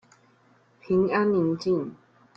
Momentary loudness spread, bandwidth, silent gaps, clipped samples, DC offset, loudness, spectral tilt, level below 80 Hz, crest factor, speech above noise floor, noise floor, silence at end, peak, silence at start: 6 LU; 7.2 kHz; none; under 0.1%; under 0.1%; -25 LUFS; -8 dB/octave; -64 dBFS; 16 dB; 37 dB; -61 dBFS; 0.45 s; -12 dBFS; 0.9 s